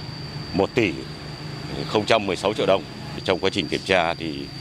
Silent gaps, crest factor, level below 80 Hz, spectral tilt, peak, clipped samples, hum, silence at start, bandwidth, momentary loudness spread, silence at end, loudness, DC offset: none; 24 dB; -48 dBFS; -5 dB/octave; 0 dBFS; under 0.1%; none; 0 s; 15 kHz; 13 LU; 0 s; -23 LUFS; under 0.1%